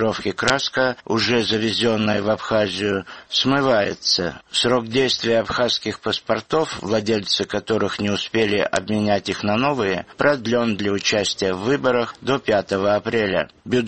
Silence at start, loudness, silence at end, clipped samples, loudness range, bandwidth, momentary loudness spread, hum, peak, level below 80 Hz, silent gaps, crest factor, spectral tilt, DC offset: 0 s; -20 LUFS; 0 s; under 0.1%; 2 LU; 8.8 kHz; 4 LU; none; 0 dBFS; -52 dBFS; none; 20 dB; -4 dB/octave; 0.1%